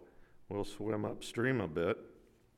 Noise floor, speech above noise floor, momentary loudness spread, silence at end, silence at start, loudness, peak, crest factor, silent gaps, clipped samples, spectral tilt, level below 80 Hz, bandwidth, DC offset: -58 dBFS; 22 dB; 8 LU; 0.4 s; 0 s; -37 LUFS; -20 dBFS; 18 dB; none; under 0.1%; -6 dB/octave; -60 dBFS; 16 kHz; under 0.1%